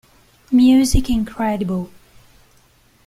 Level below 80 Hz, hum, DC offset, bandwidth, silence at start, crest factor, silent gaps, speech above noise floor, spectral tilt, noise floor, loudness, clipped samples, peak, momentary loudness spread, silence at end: -30 dBFS; none; under 0.1%; 15 kHz; 0.5 s; 16 dB; none; 39 dB; -5.5 dB/octave; -54 dBFS; -17 LUFS; under 0.1%; -4 dBFS; 12 LU; 1.2 s